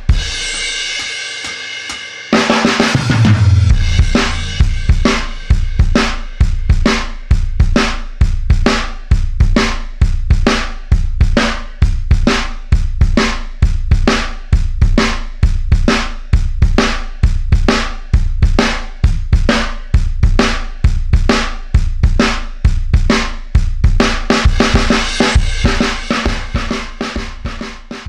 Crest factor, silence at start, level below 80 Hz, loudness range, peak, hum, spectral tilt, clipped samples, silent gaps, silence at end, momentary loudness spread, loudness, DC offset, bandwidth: 12 dB; 0 s; -14 dBFS; 2 LU; 0 dBFS; none; -5 dB/octave; under 0.1%; none; 0 s; 6 LU; -15 LUFS; under 0.1%; 10 kHz